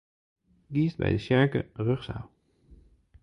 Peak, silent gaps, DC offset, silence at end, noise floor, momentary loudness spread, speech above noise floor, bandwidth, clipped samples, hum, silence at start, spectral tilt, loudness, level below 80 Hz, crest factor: -10 dBFS; none; under 0.1%; 0.95 s; -57 dBFS; 16 LU; 30 dB; 9.8 kHz; under 0.1%; none; 0.7 s; -8.5 dB/octave; -28 LUFS; -50 dBFS; 20 dB